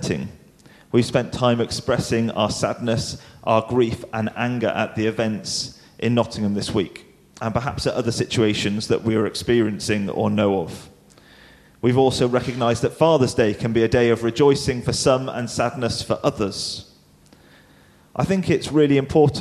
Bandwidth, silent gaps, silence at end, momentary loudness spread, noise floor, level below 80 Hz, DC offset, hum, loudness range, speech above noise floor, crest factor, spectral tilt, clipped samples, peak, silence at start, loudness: 13.5 kHz; none; 0 s; 9 LU; -52 dBFS; -48 dBFS; under 0.1%; none; 5 LU; 32 dB; 20 dB; -5.5 dB/octave; under 0.1%; -2 dBFS; 0 s; -21 LUFS